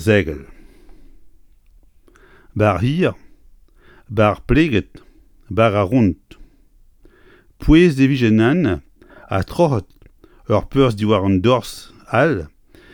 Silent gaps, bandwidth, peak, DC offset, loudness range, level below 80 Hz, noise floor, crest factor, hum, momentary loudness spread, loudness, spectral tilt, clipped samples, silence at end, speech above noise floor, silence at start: none; 17.5 kHz; 0 dBFS; under 0.1%; 6 LU; -34 dBFS; -50 dBFS; 18 dB; none; 13 LU; -17 LUFS; -7.5 dB/octave; under 0.1%; 0.45 s; 35 dB; 0 s